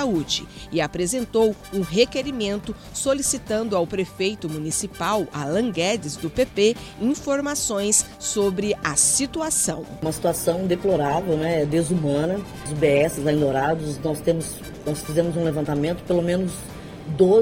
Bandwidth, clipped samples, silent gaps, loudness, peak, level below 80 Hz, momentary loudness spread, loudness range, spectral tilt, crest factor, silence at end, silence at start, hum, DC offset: 17 kHz; under 0.1%; none; -23 LUFS; -2 dBFS; -46 dBFS; 9 LU; 3 LU; -4 dB/octave; 20 dB; 0 s; 0 s; none; under 0.1%